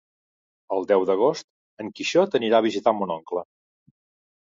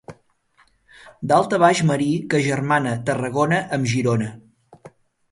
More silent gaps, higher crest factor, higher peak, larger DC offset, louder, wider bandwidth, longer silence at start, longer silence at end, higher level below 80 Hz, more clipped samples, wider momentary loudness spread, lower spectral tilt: first, 1.44-1.77 s vs none; about the same, 20 dB vs 20 dB; about the same, -4 dBFS vs -2 dBFS; neither; second, -23 LUFS vs -20 LUFS; second, 7.6 kHz vs 11.5 kHz; first, 0.7 s vs 0.1 s; first, 1.05 s vs 0.45 s; second, -72 dBFS vs -58 dBFS; neither; first, 13 LU vs 7 LU; about the same, -5 dB/octave vs -6 dB/octave